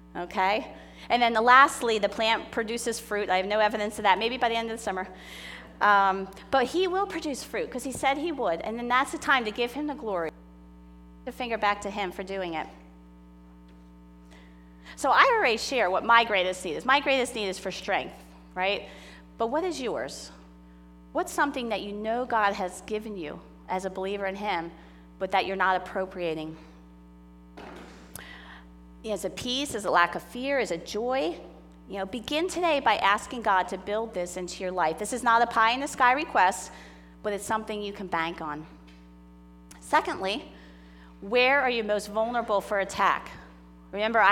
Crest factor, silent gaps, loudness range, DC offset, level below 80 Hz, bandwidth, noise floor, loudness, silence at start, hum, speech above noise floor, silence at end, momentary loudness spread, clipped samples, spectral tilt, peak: 24 dB; none; 9 LU; under 0.1%; -54 dBFS; 18 kHz; -50 dBFS; -26 LUFS; 0 s; 60 Hz at -50 dBFS; 24 dB; 0 s; 19 LU; under 0.1%; -3 dB/octave; -4 dBFS